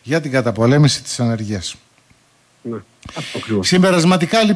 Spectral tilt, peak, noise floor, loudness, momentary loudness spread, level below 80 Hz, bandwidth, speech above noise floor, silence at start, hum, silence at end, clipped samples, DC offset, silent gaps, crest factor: -5 dB/octave; -2 dBFS; -55 dBFS; -16 LUFS; 17 LU; -52 dBFS; 11 kHz; 39 dB; 0.05 s; none; 0 s; under 0.1%; under 0.1%; none; 14 dB